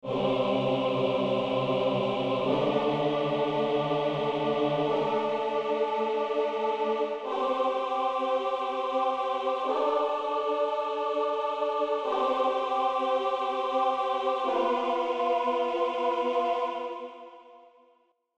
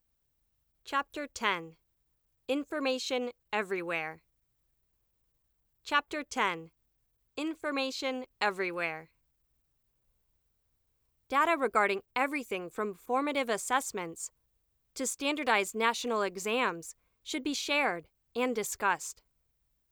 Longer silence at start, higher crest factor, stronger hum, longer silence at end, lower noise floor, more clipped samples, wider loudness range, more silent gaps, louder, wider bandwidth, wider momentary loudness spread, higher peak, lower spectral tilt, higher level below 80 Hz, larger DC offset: second, 0.05 s vs 0.85 s; second, 14 dB vs 22 dB; neither; about the same, 0.8 s vs 0.8 s; second, -66 dBFS vs -77 dBFS; neither; second, 1 LU vs 5 LU; neither; first, -28 LUFS vs -32 LUFS; second, 9 kHz vs over 20 kHz; second, 2 LU vs 13 LU; about the same, -14 dBFS vs -12 dBFS; first, -6.5 dB/octave vs -2.5 dB/octave; first, -66 dBFS vs -74 dBFS; neither